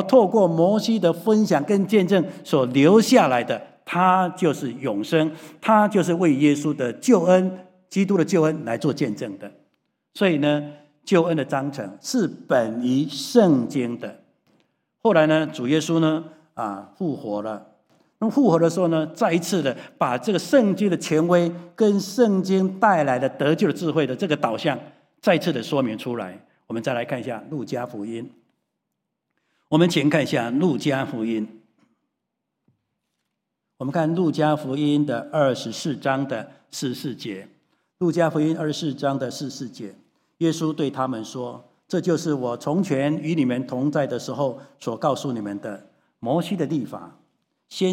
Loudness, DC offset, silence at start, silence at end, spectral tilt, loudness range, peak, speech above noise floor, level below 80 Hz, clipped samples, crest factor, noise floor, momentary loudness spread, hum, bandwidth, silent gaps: -22 LUFS; under 0.1%; 0 s; 0 s; -6 dB/octave; 7 LU; -2 dBFS; 59 dB; -74 dBFS; under 0.1%; 20 dB; -80 dBFS; 14 LU; none; 16.5 kHz; none